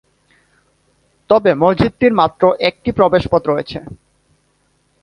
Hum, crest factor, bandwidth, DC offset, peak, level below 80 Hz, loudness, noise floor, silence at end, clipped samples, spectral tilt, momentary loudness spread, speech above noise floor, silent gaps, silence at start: 50 Hz at -50 dBFS; 16 dB; 10.5 kHz; under 0.1%; 0 dBFS; -42 dBFS; -14 LUFS; -61 dBFS; 1.1 s; under 0.1%; -8 dB/octave; 7 LU; 47 dB; none; 1.3 s